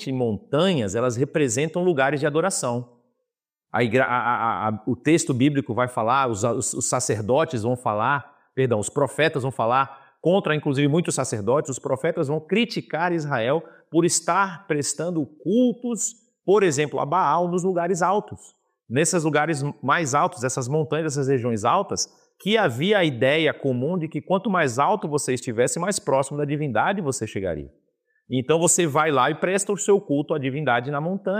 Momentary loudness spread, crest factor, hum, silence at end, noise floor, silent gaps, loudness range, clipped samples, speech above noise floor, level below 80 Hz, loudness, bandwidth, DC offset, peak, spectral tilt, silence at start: 7 LU; 16 dB; none; 0 s; -83 dBFS; none; 1 LU; under 0.1%; 61 dB; -64 dBFS; -23 LUFS; 15.5 kHz; under 0.1%; -6 dBFS; -4.5 dB/octave; 0 s